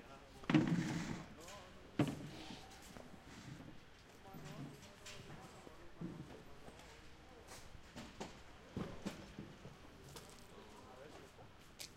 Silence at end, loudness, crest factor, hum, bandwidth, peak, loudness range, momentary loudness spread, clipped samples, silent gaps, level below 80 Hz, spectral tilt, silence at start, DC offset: 0 s; -47 LUFS; 30 dB; none; 16 kHz; -18 dBFS; 13 LU; 18 LU; under 0.1%; none; -64 dBFS; -6 dB/octave; 0 s; under 0.1%